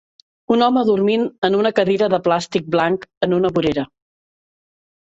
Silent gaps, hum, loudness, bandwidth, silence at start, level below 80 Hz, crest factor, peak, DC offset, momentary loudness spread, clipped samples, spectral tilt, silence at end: 1.38-1.42 s, 3.17-3.21 s; none; -18 LUFS; 8 kHz; 0.5 s; -54 dBFS; 16 dB; -2 dBFS; under 0.1%; 5 LU; under 0.1%; -6 dB/octave; 1.2 s